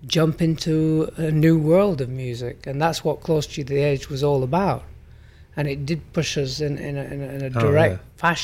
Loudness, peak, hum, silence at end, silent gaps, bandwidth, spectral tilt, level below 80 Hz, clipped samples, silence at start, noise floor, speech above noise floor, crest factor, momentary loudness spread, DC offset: -22 LUFS; -4 dBFS; none; 0 s; none; 15.5 kHz; -6 dB/octave; -44 dBFS; under 0.1%; 0 s; -46 dBFS; 25 dB; 18 dB; 11 LU; under 0.1%